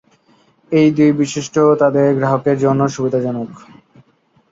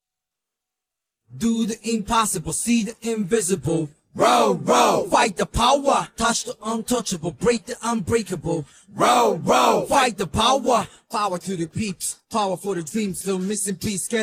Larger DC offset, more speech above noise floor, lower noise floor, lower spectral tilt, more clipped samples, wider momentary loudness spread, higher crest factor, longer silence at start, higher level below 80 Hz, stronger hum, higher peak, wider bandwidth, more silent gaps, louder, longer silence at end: neither; second, 42 dB vs 64 dB; second, -57 dBFS vs -86 dBFS; first, -7 dB/octave vs -4 dB/octave; neither; about the same, 7 LU vs 9 LU; about the same, 14 dB vs 18 dB; second, 0.7 s vs 1.3 s; second, -58 dBFS vs -46 dBFS; neither; about the same, -2 dBFS vs -4 dBFS; second, 7.8 kHz vs 16 kHz; neither; first, -15 LUFS vs -21 LUFS; first, 0.95 s vs 0 s